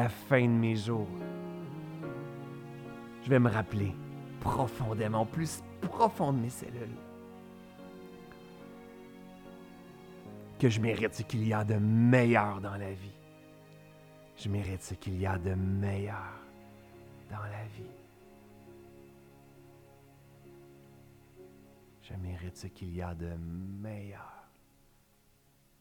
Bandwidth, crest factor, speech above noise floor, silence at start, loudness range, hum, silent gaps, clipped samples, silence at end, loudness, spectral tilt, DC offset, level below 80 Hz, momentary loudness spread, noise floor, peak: 18 kHz; 24 dB; 35 dB; 0 s; 19 LU; none; none; under 0.1%; 1.4 s; -33 LUFS; -7 dB/octave; under 0.1%; -60 dBFS; 24 LU; -66 dBFS; -10 dBFS